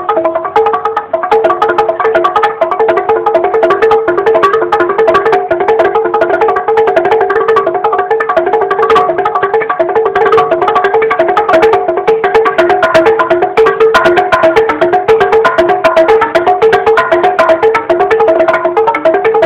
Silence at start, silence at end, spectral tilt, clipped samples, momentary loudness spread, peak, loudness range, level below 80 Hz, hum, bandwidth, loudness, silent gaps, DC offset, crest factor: 0 s; 0 s; -5.5 dB/octave; 1%; 4 LU; 0 dBFS; 2 LU; -44 dBFS; none; 9.8 kHz; -9 LUFS; none; under 0.1%; 8 dB